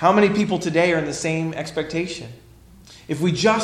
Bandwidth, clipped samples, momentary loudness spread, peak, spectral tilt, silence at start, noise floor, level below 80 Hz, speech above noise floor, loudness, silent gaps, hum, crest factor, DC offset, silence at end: 13.5 kHz; under 0.1%; 12 LU; -2 dBFS; -5 dB/octave; 0 s; -47 dBFS; -52 dBFS; 26 dB; -21 LUFS; none; none; 18 dB; under 0.1%; 0 s